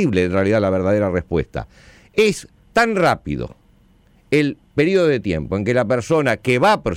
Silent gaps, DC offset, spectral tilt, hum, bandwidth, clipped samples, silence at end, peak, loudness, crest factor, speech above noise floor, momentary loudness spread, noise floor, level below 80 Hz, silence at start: none; under 0.1%; -6 dB/octave; none; 16 kHz; under 0.1%; 0 s; -6 dBFS; -18 LUFS; 12 dB; 36 dB; 12 LU; -53 dBFS; -42 dBFS; 0 s